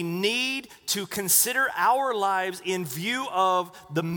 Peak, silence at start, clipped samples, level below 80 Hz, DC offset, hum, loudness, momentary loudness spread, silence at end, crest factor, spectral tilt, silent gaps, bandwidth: -6 dBFS; 0 s; under 0.1%; -70 dBFS; under 0.1%; none; -25 LUFS; 10 LU; 0 s; 20 dB; -2.5 dB/octave; none; over 20 kHz